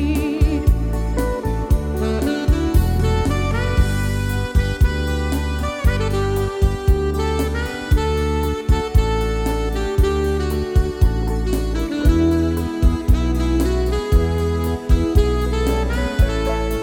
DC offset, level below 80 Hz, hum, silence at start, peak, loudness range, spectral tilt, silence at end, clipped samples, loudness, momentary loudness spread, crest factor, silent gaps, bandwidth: under 0.1%; -20 dBFS; none; 0 s; -2 dBFS; 1 LU; -6.5 dB/octave; 0 s; under 0.1%; -20 LUFS; 4 LU; 16 dB; none; 17.5 kHz